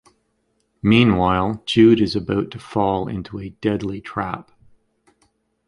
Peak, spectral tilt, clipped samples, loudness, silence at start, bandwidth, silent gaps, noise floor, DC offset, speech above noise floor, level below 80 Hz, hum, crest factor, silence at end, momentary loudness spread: -2 dBFS; -7 dB/octave; under 0.1%; -19 LUFS; 0.85 s; 11 kHz; none; -68 dBFS; under 0.1%; 50 dB; -44 dBFS; none; 18 dB; 1.25 s; 14 LU